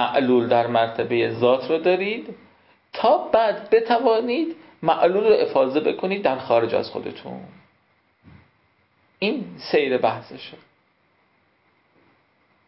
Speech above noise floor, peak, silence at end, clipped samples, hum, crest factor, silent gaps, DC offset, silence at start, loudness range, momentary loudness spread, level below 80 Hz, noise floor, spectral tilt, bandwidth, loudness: 43 dB; -6 dBFS; 2.15 s; under 0.1%; none; 18 dB; none; under 0.1%; 0 s; 8 LU; 15 LU; -64 dBFS; -64 dBFS; -10 dB/octave; 5.8 kHz; -21 LUFS